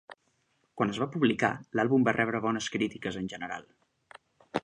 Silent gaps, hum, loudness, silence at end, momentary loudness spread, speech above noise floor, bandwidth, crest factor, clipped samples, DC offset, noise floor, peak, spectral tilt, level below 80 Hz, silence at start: none; none; -29 LUFS; 0.05 s; 12 LU; 44 dB; 9.8 kHz; 20 dB; under 0.1%; under 0.1%; -73 dBFS; -10 dBFS; -5.5 dB/octave; -66 dBFS; 0.75 s